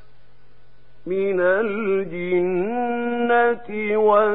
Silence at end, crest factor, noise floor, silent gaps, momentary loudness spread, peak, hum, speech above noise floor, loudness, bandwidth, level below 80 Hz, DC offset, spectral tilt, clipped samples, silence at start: 0 s; 16 dB; -56 dBFS; none; 7 LU; -4 dBFS; none; 36 dB; -21 LUFS; 4 kHz; -60 dBFS; 1%; -11 dB/octave; under 0.1%; 1.05 s